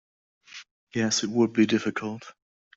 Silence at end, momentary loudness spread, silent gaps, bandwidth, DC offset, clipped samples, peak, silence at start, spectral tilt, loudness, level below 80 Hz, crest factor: 0.45 s; 22 LU; 0.71-0.87 s; 7.8 kHz; under 0.1%; under 0.1%; -10 dBFS; 0.55 s; -4 dB/octave; -25 LUFS; -68 dBFS; 18 dB